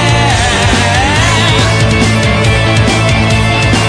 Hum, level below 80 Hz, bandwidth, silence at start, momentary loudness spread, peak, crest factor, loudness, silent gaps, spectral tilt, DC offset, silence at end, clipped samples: none; -20 dBFS; 10.5 kHz; 0 s; 1 LU; 0 dBFS; 8 dB; -9 LUFS; none; -4.5 dB/octave; under 0.1%; 0 s; under 0.1%